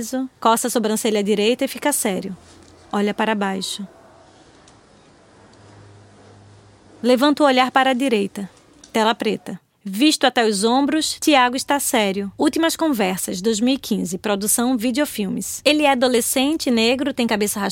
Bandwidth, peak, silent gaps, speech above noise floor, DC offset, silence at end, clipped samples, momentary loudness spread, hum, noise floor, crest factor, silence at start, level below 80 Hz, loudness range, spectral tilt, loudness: 17 kHz; 0 dBFS; none; 31 dB; under 0.1%; 0 s; under 0.1%; 10 LU; none; -50 dBFS; 20 dB; 0 s; -60 dBFS; 8 LU; -3 dB/octave; -19 LUFS